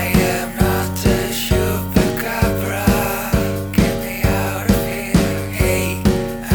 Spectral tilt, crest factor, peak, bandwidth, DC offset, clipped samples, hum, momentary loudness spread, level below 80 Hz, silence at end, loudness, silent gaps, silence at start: -5.5 dB/octave; 16 dB; -2 dBFS; over 20 kHz; under 0.1%; under 0.1%; none; 2 LU; -26 dBFS; 0 s; -18 LUFS; none; 0 s